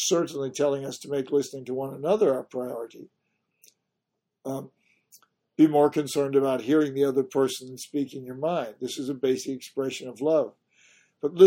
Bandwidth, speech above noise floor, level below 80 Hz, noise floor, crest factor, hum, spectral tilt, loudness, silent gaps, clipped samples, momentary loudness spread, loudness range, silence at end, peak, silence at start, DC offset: 16.5 kHz; 56 dB; -74 dBFS; -82 dBFS; 22 dB; none; -5 dB/octave; -27 LUFS; none; under 0.1%; 12 LU; 6 LU; 0 s; -4 dBFS; 0 s; under 0.1%